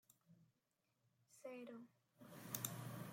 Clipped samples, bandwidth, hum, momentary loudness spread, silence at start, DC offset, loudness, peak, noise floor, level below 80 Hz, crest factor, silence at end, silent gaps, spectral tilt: under 0.1%; 16.5 kHz; none; 17 LU; 0.1 s; under 0.1%; -52 LUFS; -26 dBFS; -87 dBFS; -88 dBFS; 30 dB; 0 s; none; -4 dB/octave